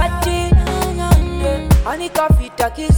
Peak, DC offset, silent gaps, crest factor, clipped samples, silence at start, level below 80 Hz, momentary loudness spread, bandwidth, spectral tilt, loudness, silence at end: 0 dBFS; under 0.1%; none; 14 dB; under 0.1%; 0 s; -18 dBFS; 5 LU; 19 kHz; -6 dB/octave; -16 LUFS; 0 s